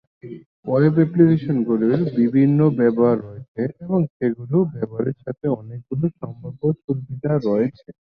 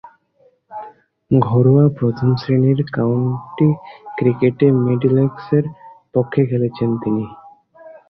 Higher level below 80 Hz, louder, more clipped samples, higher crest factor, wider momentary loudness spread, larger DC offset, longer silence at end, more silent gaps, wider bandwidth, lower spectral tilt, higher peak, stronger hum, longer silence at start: second, -58 dBFS vs -52 dBFS; second, -20 LUFS vs -17 LUFS; neither; about the same, 18 dB vs 16 dB; about the same, 12 LU vs 14 LU; neither; first, 0.5 s vs 0.15 s; first, 0.46-0.63 s, 3.48-3.55 s, 4.10-4.20 s, 6.84-6.88 s vs none; about the same, 5.6 kHz vs 5.8 kHz; about the same, -12 dB/octave vs -11.5 dB/octave; about the same, -2 dBFS vs -2 dBFS; neither; first, 0.25 s vs 0.05 s